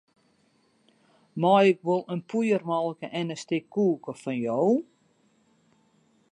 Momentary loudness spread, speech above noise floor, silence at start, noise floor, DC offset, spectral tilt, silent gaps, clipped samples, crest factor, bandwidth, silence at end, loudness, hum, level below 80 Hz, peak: 12 LU; 41 dB; 1.35 s; -66 dBFS; under 0.1%; -6.5 dB/octave; none; under 0.1%; 20 dB; 11 kHz; 1.5 s; -26 LUFS; none; -80 dBFS; -8 dBFS